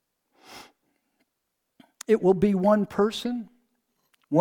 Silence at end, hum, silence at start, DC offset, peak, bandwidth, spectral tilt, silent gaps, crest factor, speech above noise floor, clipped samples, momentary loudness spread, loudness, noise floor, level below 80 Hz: 0 s; none; 0.5 s; under 0.1%; -8 dBFS; 16 kHz; -7 dB/octave; none; 18 dB; 57 dB; under 0.1%; 20 LU; -24 LUFS; -80 dBFS; -60 dBFS